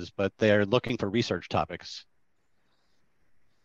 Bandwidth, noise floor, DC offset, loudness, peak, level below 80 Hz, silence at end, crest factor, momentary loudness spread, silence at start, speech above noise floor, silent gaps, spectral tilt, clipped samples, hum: 7.8 kHz; -76 dBFS; under 0.1%; -27 LUFS; -10 dBFS; -62 dBFS; 1.65 s; 20 dB; 16 LU; 0 s; 48 dB; none; -6 dB/octave; under 0.1%; none